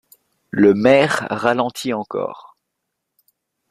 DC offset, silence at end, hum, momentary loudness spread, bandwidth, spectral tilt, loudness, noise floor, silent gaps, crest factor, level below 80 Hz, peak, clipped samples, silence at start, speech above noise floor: under 0.1%; 1.3 s; none; 13 LU; 14.5 kHz; -5.5 dB/octave; -17 LUFS; -77 dBFS; none; 18 dB; -58 dBFS; -2 dBFS; under 0.1%; 0.55 s; 61 dB